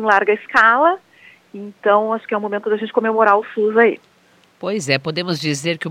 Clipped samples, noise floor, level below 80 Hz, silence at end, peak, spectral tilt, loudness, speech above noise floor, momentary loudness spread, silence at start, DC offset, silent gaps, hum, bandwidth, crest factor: under 0.1%; -54 dBFS; -66 dBFS; 0 s; 0 dBFS; -4.5 dB/octave; -17 LUFS; 37 dB; 12 LU; 0 s; under 0.1%; none; none; 14 kHz; 18 dB